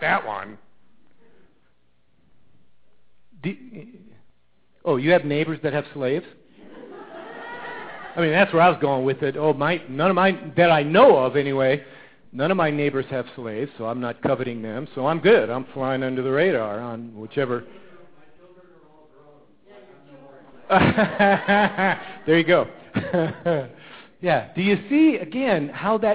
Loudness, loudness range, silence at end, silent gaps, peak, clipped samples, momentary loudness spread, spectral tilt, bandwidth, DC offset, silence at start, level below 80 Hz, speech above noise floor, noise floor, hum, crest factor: -21 LUFS; 15 LU; 0 s; none; -4 dBFS; under 0.1%; 17 LU; -10 dB/octave; 4 kHz; 0.3%; 0 s; -56 dBFS; 46 dB; -67 dBFS; none; 20 dB